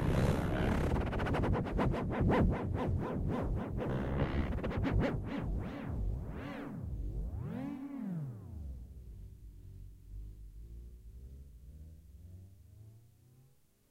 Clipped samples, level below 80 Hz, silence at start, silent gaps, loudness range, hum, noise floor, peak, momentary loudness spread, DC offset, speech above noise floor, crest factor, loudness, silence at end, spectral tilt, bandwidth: under 0.1%; -42 dBFS; 0 s; none; 20 LU; none; -67 dBFS; -18 dBFS; 22 LU; under 0.1%; 33 dB; 18 dB; -36 LUFS; 0.9 s; -8 dB/octave; 14.5 kHz